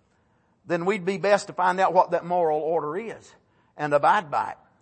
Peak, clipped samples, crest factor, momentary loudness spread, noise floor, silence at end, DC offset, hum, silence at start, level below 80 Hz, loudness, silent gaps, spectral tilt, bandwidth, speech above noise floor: -6 dBFS; under 0.1%; 20 dB; 12 LU; -65 dBFS; 0.3 s; under 0.1%; none; 0.65 s; -72 dBFS; -24 LUFS; none; -5.5 dB/octave; 8.8 kHz; 42 dB